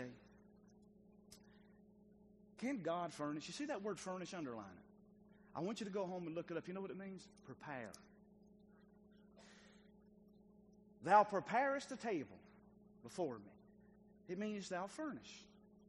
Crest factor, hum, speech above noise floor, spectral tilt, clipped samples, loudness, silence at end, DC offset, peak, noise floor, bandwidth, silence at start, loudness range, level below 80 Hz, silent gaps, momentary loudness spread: 26 dB; 60 Hz at -75 dBFS; 24 dB; -5 dB/octave; under 0.1%; -43 LUFS; 0.2 s; under 0.1%; -18 dBFS; -67 dBFS; 10.5 kHz; 0 s; 14 LU; -80 dBFS; none; 25 LU